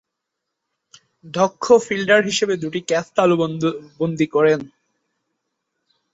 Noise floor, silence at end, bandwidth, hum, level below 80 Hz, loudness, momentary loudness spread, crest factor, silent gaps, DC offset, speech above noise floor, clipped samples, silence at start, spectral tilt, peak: -80 dBFS; 1.45 s; 8 kHz; none; -62 dBFS; -19 LUFS; 8 LU; 18 dB; none; under 0.1%; 62 dB; under 0.1%; 1.25 s; -4.5 dB/octave; -2 dBFS